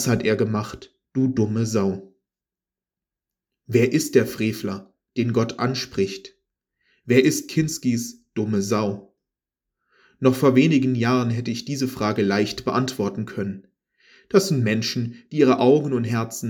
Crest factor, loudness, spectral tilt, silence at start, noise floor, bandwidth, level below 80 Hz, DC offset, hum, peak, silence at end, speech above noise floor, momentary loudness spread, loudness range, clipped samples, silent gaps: 20 dB; -22 LUFS; -6 dB/octave; 0 s; under -90 dBFS; over 20 kHz; -58 dBFS; under 0.1%; none; -4 dBFS; 0 s; over 69 dB; 12 LU; 4 LU; under 0.1%; none